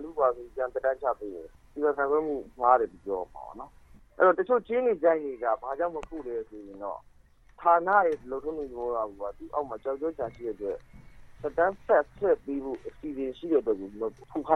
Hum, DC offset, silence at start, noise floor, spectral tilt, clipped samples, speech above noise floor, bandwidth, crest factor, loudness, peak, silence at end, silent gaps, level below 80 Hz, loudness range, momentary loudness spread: none; under 0.1%; 0 s; -56 dBFS; -7.5 dB/octave; under 0.1%; 28 dB; 6.4 kHz; 22 dB; -29 LUFS; -8 dBFS; 0 s; none; -58 dBFS; 4 LU; 15 LU